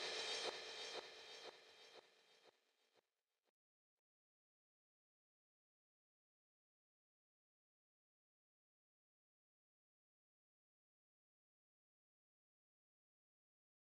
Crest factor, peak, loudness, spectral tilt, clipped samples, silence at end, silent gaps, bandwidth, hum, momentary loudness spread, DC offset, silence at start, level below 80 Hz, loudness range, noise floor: 26 dB; -34 dBFS; -49 LUFS; 0.5 dB/octave; under 0.1%; 11 s; none; 13 kHz; none; 19 LU; under 0.1%; 0 s; under -90 dBFS; 15 LU; under -90 dBFS